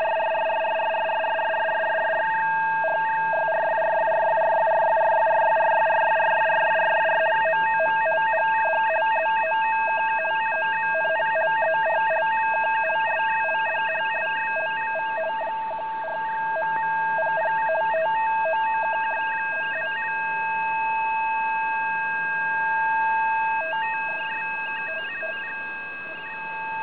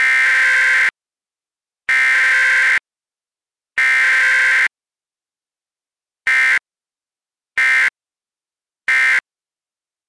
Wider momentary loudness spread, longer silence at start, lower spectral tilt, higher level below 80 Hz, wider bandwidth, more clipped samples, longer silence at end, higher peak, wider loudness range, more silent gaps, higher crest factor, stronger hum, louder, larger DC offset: about the same, 7 LU vs 7 LU; about the same, 0 s vs 0 s; first, -6 dB/octave vs 2 dB/octave; about the same, -68 dBFS vs -64 dBFS; second, 4 kHz vs 11 kHz; neither; second, 0 s vs 0.9 s; second, -12 dBFS vs -8 dBFS; about the same, 5 LU vs 4 LU; neither; about the same, 10 dB vs 10 dB; neither; second, -23 LUFS vs -13 LUFS; first, 0.4% vs under 0.1%